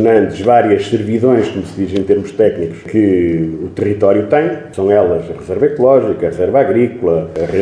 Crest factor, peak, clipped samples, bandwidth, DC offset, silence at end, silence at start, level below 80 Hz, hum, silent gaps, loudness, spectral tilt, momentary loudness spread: 12 dB; 0 dBFS; under 0.1%; 10 kHz; under 0.1%; 0 s; 0 s; -44 dBFS; none; none; -13 LUFS; -8 dB/octave; 8 LU